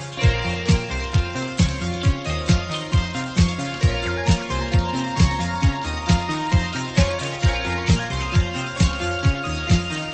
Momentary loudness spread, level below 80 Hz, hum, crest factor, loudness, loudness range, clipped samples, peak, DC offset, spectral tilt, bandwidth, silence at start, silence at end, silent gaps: 3 LU; -28 dBFS; none; 16 dB; -22 LUFS; 1 LU; under 0.1%; -4 dBFS; under 0.1%; -5.5 dB/octave; 8.8 kHz; 0 s; 0 s; none